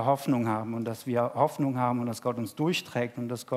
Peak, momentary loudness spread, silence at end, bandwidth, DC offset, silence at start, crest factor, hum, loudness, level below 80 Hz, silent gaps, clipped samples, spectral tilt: -10 dBFS; 6 LU; 0 s; 16 kHz; under 0.1%; 0 s; 20 dB; none; -29 LUFS; -76 dBFS; none; under 0.1%; -6 dB/octave